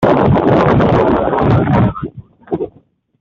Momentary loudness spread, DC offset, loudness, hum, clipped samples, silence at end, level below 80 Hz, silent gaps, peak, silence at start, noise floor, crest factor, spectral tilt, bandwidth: 14 LU; under 0.1%; -13 LUFS; none; under 0.1%; 0.5 s; -32 dBFS; none; -2 dBFS; 0 s; -50 dBFS; 10 dB; -9.5 dB/octave; 6.8 kHz